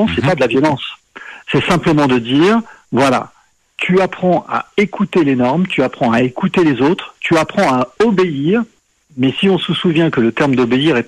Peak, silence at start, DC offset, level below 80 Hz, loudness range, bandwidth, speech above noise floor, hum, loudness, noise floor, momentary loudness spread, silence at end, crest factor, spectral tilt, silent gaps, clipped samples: -2 dBFS; 0 s; under 0.1%; -46 dBFS; 1 LU; 12.5 kHz; 20 dB; none; -14 LUFS; -34 dBFS; 7 LU; 0.05 s; 12 dB; -6.5 dB/octave; none; under 0.1%